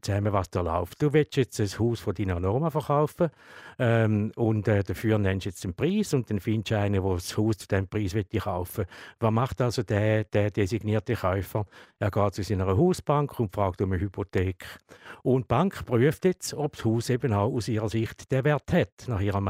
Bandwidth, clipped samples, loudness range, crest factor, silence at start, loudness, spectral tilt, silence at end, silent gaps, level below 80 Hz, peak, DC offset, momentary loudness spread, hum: 16 kHz; under 0.1%; 2 LU; 16 dB; 0.05 s; -27 LUFS; -7 dB/octave; 0 s; 18.92-18.97 s; -50 dBFS; -10 dBFS; under 0.1%; 7 LU; none